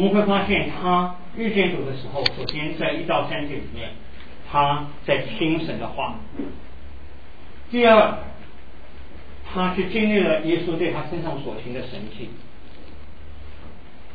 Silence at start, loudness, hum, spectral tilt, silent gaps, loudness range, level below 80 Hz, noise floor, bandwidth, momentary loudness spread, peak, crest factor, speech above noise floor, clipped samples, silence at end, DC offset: 0 s; -22 LUFS; none; -7.5 dB/octave; none; 5 LU; -44 dBFS; -44 dBFS; 5 kHz; 24 LU; -2 dBFS; 22 dB; 22 dB; under 0.1%; 0 s; 3%